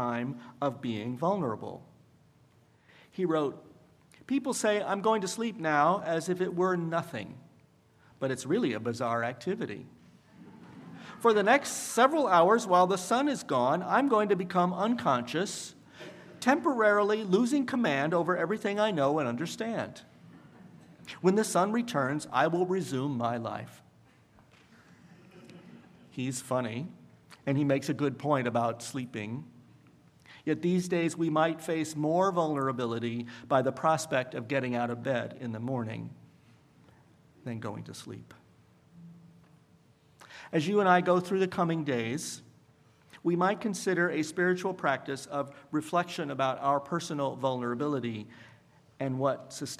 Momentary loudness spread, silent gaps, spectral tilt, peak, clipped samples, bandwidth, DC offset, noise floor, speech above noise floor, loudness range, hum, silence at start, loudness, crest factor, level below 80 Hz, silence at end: 15 LU; none; -5.5 dB/octave; -8 dBFS; under 0.1%; 15 kHz; under 0.1%; -63 dBFS; 34 dB; 11 LU; none; 0 s; -30 LUFS; 22 dB; -76 dBFS; 0.05 s